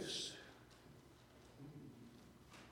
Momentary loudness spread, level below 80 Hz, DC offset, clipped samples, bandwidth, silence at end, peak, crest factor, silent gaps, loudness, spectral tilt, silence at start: 18 LU; -74 dBFS; under 0.1%; under 0.1%; 18 kHz; 0 s; -34 dBFS; 20 dB; none; -54 LUFS; -2.5 dB/octave; 0 s